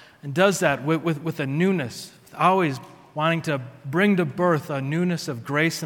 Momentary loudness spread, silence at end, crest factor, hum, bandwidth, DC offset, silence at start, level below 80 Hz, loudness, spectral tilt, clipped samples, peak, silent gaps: 10 LU; 0 s; 20 dB; none; 18 kHz; under 0.1%; 0.25 s; -66 dBFS; -23 LUFS; -5.5 dB/octave; under 0.1%; -4 dBFS; none